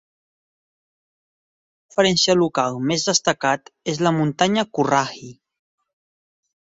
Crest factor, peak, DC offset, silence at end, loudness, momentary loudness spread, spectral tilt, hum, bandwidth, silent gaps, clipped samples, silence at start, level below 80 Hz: 20 dB; -2 dBFS; under 0.1%; 1.3 s; -20 LUFS; 10 LU; -4 dB/octave; none; 8.2 kHz; none; under 0.1%; 1.95 s; -62 dBFS